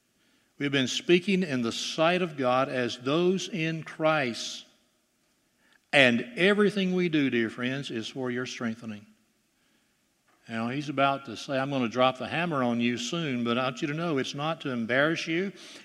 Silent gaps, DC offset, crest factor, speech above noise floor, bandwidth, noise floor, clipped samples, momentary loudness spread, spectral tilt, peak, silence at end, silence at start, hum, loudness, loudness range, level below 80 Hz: none; under 0.1%; 24 dB; 43 dB; 12.5 kHz; -71 dBFS; under 0.1%; 10 LU; -5 dB/octave; -4 dBFS; 0 s; 0.6 s; none; -27 LUFS; 7 LU; -76 dBFS